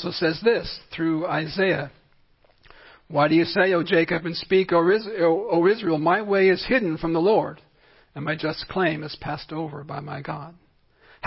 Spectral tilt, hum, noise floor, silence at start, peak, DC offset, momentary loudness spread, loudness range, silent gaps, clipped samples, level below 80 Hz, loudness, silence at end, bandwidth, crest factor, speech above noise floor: -10 dB/octave; none; -59 dBFS; 0 s; -6 dBFS; under 0.1%; 13 LU; 8 LU; none; under 0.1%; -54 dBFS; -23 LUFS; 0 s; 5.8 kHz; 18 dB; 36 dB